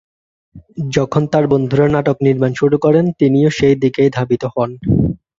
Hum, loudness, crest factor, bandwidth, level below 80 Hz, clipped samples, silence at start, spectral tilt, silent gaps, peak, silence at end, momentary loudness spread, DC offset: none; -14 LUFS; 12 dB; 7.6 kHz; -40 dBFS; under 0.1%; 0.55 s; -7.5 dB/octave; none; -2 dBFS; 0.25 s; 6 LU; under 0.1%